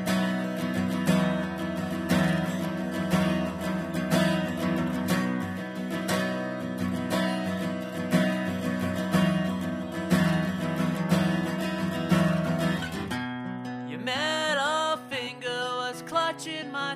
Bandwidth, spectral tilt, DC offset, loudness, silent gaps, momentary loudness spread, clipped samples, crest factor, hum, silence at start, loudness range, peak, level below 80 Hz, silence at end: 15.5 kHz; -5.5 dB/octave; under 0.1%; -28 LUFS; none; 7 LU; under 0.1%; 18 dB; none; 0 s; 2 LU; -10 dBFS; -56 dBFS; 0 s